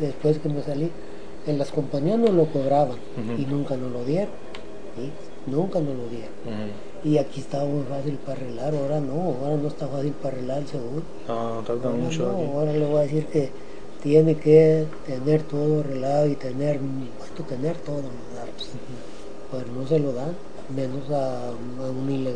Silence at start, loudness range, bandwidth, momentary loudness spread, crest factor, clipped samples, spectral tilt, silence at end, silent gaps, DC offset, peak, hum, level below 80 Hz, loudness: 0 s; 9 LU; 10 kHz; 16 LU; 22 dB; under 0.1%; -8 dB/octave; 0 s; none; 3%; -4 dBFS; none; -56 dBFS; -25 LUFS